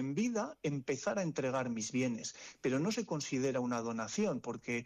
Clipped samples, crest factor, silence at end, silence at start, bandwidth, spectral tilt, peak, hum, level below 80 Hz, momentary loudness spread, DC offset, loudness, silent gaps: under 0.1%; 10 dB; 0 s; 0 s; 10.5 kHz; -5 dB/octave; -26 dBFS; none; -74 dBFS; 4 LU; under 0.1%; -37 LUFS; none